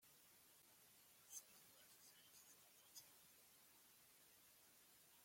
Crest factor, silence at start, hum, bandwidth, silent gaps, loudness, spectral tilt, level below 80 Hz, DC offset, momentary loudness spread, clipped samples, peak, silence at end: 26 dB; 0 s; none; 16.5 kHz; none; -66 LUFS; 0 dB/octave; under -90 dBFS; under 0.1%; 10 LU; under 0.1%; -42 dBFS; 0 s